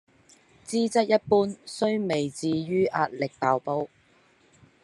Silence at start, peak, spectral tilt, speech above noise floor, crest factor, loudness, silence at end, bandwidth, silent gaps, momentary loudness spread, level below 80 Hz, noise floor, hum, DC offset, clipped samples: 0.7 s; -8 dBFS; -5.5 dB/octave; 36 dB; 20 dB; -26 LUFS; 0.95 s; 11.5 kHz; none; 9 LU; -70 dBFS; -61 dBFS; none; under 0.1%; under 0.1%